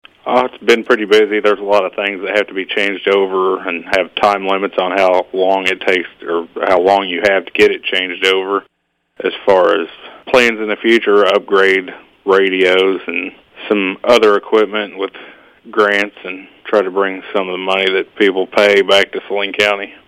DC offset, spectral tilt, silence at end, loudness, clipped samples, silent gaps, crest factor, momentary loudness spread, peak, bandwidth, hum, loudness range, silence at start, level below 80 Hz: under 0.1%; -4 dB/octave; 0.15 s; -14 LUFS; under 0.1%; none; 14 dB; 10 LU; 0 dBFS; 14.5 kHz; none; 2 LU; 0.25 s; -56 dBFS